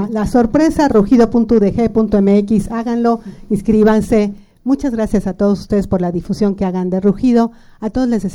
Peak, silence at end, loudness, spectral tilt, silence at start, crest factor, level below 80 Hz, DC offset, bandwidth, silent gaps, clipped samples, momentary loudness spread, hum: -2 dBFS; 0 s; -14 LUFS; -8 dB/octave; 0 s; 12 dB; -34 dBFS; under 0.1%; 12 kHz; none; under 0.1%; 8 LU; none